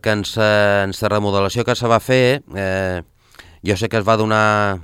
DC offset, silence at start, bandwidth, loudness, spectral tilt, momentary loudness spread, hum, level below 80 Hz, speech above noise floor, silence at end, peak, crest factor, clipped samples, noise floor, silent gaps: under 0.1%; 0.05 s; 16 kHz; -17 LUFS; -5.5 dB/octave; 7 LU; none; -50 dBFS; 29 dB; 0 s; 0 dBFS; 16 dB; under 0.1%; -45 dBFS; none